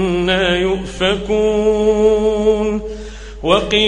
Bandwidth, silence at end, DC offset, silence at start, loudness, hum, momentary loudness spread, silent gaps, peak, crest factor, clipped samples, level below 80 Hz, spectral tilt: 9.6 kHz; 0 s; under 0.1%; 0 s; -15 LUFS; none; 11 LU; none; 0 dBFS; 16 dB; under 0.1%; -32 dBFS; -5 dB/octave